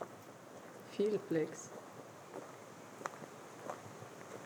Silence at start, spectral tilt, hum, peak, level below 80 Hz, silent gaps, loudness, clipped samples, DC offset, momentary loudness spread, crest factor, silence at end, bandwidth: 0 s; -5 dB/octave; none; -18 dBFS; under -90 dBFS; none; -44 LUFS; under 0.1%; under 0.1%; 16 LU; 26 dB; 0 s; over 20 kHz